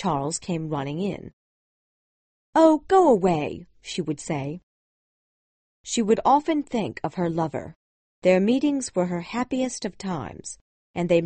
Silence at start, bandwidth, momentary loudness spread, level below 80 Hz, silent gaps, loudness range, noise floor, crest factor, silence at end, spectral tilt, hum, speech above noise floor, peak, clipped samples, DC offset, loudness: 0 s; 8.8 kHz; 18 LU; -58 dBFS; 1.33-2.53 s, 4.63-5.84 s, 7.76-8.22 s, 10.61-10.94 s; 3 LU; under -90 dBFS; 20 dB; 0 s; -5.5 dB/octave; none; over 67 dB; -4 dBFS; under 0.1%; under 0.1%; -24 LUFS